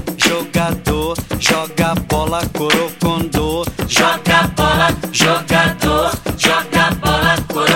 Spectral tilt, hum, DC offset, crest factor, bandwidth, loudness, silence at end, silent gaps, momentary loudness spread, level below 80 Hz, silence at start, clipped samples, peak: -4 dB/octave; none; under 0.1%; 16 dB; 17 kHz; -15 LUFS; 0 s; none; 5 LU; -30 dBFS; 0 s; under 0.1%; 0 dBFS